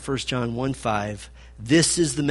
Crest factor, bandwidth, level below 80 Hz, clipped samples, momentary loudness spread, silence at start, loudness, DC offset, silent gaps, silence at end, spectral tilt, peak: 18 dB; 11.5 kHz; -46 dBFS; under 0.1%; 20 LU; 0 s; -23 LUFS; under 0.1%; none; 0 s; -4 dB/octave; -6 dBFS